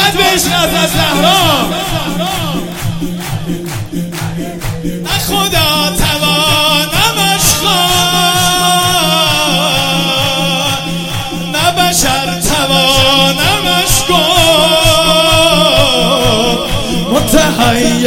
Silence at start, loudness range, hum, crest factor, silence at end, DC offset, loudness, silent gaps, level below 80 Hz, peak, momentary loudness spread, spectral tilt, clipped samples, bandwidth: 0 s; 7 LU; none; 10 dB; 0 s; under 0.1%; -10 LUFS; none; -26 dBFS; 0 dBFS; 11 LU; -3 dB/octave; 0.5%; over 20 kHz